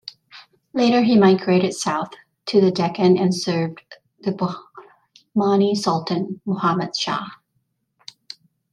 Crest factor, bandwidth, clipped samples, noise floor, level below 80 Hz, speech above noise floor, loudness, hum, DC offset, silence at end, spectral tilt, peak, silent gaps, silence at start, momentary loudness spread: 18 dB; 11.5 kHz; under 0.1%; -71 dBFS; -66 dBFS; 52 dB; -20 LUFS; none; under 0.1%; 1.4 s; -6 dB/octave; -2 dBFS; none; 0.05 s; 19 LU